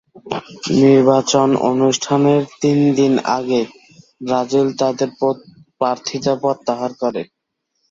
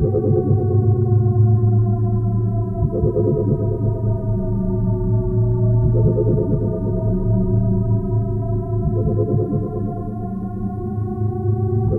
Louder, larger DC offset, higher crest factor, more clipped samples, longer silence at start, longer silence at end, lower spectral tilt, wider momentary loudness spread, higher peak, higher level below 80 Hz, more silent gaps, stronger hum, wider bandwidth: first, -16 LUFS vs -19 LUFS; neither; about the same, 16 dB vs 12 dB; neither; first, 0.15 s vs 0 s; first, 0.65 s vs 0 s; second, -5.5 dB/octave vs -14 dB/octave; first, 14 LU vs 8 LU; about the same, -2 dBFS vs -4 dBFS; second, -58 dBFS vs -30 dBFS; neither; neither; first, 7.8 kHz vs 1.6 kHz